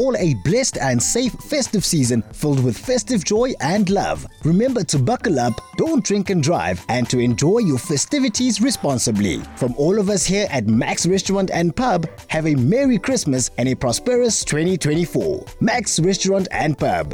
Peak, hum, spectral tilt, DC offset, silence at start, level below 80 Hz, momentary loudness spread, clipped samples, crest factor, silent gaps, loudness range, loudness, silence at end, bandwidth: -8 dBFS; none; -4.5 dB/octave; under 0.1%; 0 s; -42 dBFS; 4 LU; under 0.1%; 10 dB; none; 1 LU; -19 LUFS; 0 s; 19 kHz